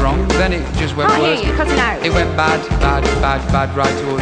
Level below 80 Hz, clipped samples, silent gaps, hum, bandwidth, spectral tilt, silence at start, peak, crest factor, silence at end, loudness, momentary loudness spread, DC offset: -22 dBFS; under 0.1%; none; none; 10 kHz; -5.5 dB/octave; 0 s; -2 dBFS; 14 dB; 0 s; -15 LUFS; 3 LU; under 0.1%